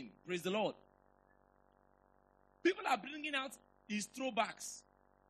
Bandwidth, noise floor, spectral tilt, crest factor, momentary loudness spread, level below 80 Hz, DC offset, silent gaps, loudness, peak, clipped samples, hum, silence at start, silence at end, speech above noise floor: 13 kHz; -71 dBFS; -3.5 dB/octave; 24 dB; 11 LU; -80 dBFS; under 0.1%; none; -39 LUFS; -20 dBFS; under 0.1%; none; 0 s; 0.5 s; 32 dB